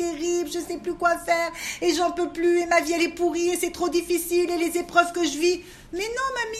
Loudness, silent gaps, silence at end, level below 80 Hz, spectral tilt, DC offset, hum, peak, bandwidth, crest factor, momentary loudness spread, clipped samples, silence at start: -24 LUFS; none; 0 s; -52 dBFS; -2.5 dB/octave; under 0.1%; none; -4 dBFS; 14.5 kHz; 20 dB; 8 LU; under 0.1%; 0 s